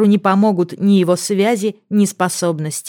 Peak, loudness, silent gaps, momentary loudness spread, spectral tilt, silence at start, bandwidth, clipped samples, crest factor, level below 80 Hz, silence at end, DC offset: -2 dBFS; -16 LUFS; none; 6 LU; -5.5 dB/octave; 0 s; 17 kHz; under 0.1%; 14 dB; -70 dBFS; 0 s; under 0.1%